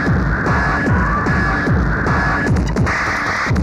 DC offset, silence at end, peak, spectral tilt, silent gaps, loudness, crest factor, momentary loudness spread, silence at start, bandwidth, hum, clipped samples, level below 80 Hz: under 0.1%; 0 s; -4 dBFS; -6.5 dB/octave; none; -16 LUFS; 12 dB; 1 LU; 0 s; 11.5 kHz; none; under 0.1%; -24 dBFS